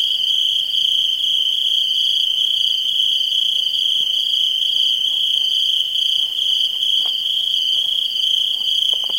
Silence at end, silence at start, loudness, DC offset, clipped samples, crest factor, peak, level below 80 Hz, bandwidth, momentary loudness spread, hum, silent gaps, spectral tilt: 0 s; 0 s; -15 LUFS; under 0.1%; under 0.1%; 14 dB; -4 dBFS; -64 dBFS; 16.5 kHz; 1 LU; none; none; 2.5 dB/octave